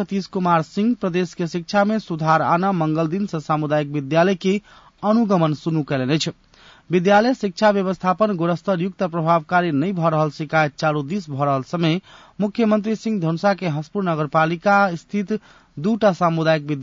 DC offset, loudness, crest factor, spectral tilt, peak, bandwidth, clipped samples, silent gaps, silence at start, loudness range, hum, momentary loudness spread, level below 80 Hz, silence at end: under 0.1%; -20 LUFS; 14 dB; -7 dB/octave; -4 dBFS; 7.6 kHz; under 0.1%; none; 0 s; 2 LU; none; 8 LU; -60 dBFS; 0 s